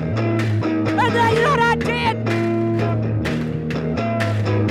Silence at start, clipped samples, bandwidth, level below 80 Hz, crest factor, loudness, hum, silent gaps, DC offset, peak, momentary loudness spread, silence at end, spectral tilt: 0 s; under 0.1%; 12 kHz; -42 dBFS; 12 dB; -19 LUFS; none; none; under 0.1%; -6 dBFS; 6 LU; 0 s; -7 dB/octave